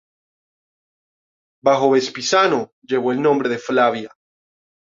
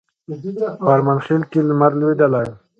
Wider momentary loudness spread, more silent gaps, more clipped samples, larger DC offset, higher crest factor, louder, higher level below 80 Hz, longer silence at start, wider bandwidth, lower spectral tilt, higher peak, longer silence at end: second, 8 LU vs 12 LU; first, 2.72-2.82 s vs none; neither; neither; about the same, 18 dB vs 18 dB; about the same, -18 LUFS vs -17 LUFS; second, -66 dBFS vs -58 dBFS; first, 1.65 s vs 0.3 s; first, 7.6 kHz vs 6.8 kHz; second, -4 dB/octave vs -10 dB/octave; about the same, -2 dBFS vs 0 dBFS; first, 0.8 s vs 0.25 s